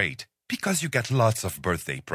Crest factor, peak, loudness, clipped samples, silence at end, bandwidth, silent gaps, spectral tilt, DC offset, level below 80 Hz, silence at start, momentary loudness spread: 20 dB; -8 dBFS; -26 LUFS; under 0.1%; 0 s; 16 kHz; none; -4.5 dB/octave; under 0.1%; -48 dBFS; 0 s; 8 LU